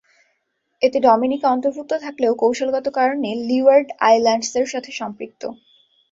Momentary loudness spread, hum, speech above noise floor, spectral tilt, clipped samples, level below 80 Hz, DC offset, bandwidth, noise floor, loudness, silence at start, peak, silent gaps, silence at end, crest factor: 14 LU; none; 53 dB; -3.5 dB/octave; under 0.1%; -64 dBFS; under 0.1%; 7.8 kHz; -71 dBFS; -18 LUFS; 0.8 s; -2 dBFS; none; 0.6 s; 16 dB